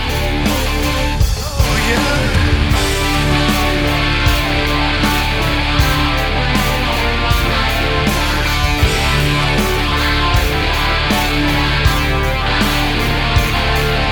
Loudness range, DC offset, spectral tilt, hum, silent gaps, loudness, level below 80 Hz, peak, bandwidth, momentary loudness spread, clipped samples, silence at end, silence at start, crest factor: 1 LU; under 0.1%; -4.5 dB/octave; none; none; -15 LUFS; -20 dBFS; 0 dBFS; over 20 kHz; 2 LU; under 0.1%; 0 s; 0 s; 14 dB